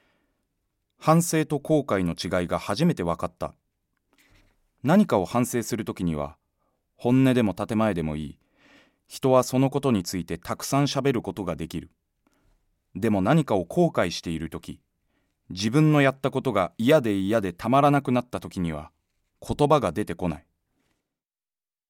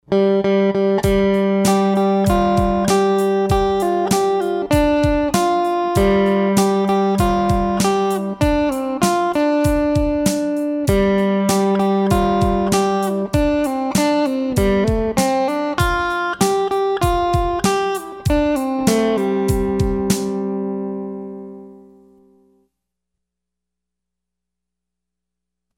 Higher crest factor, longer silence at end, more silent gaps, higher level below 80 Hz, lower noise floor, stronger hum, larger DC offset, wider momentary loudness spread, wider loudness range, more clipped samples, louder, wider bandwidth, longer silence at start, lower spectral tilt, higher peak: first, 20 dB vs 14 dB; second, 1.5 s vs 4 s; neither; second, -52 dBFS vs -32 dBFS; first, under -90 dBFS vs -83 dBFS; second, none vs 60 Hz at -45 dBFS; neither; first, 14 LU vs 4 LU; about the same, 5 LU vs 5 LU; neither; second, -24 LUFS vs -17 LUFS; about the same, 17 kHz vs 17 kHz; first, 1 s vs 0.1 s; about the same, -6 dB/octave vs -6 dB/octave; about the same, -6 dBFS vs -4 dBFS